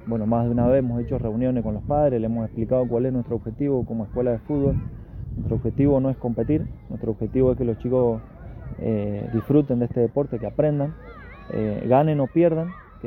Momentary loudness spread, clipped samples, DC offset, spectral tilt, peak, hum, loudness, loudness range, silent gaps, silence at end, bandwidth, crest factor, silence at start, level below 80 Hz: 12 LU; under 0.1%; under 0.1%; -12.5 dB/octave; -4 dBFS; none; -23 LUFS; 2 LU; none; 0 s; 4.2 kHz; 18 dB; 0 s; -40 dBFS